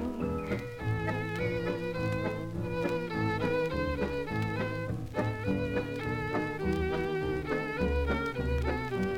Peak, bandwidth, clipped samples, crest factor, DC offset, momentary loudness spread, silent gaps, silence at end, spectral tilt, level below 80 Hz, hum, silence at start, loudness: -18 dBFS; 16.5 kHz; under 0.1%; 14 dB; under 0.1%; 4 LU; none; 0 s; -7.5 dB/octave; -44 dBFS; none; 0 s; -33 LUFS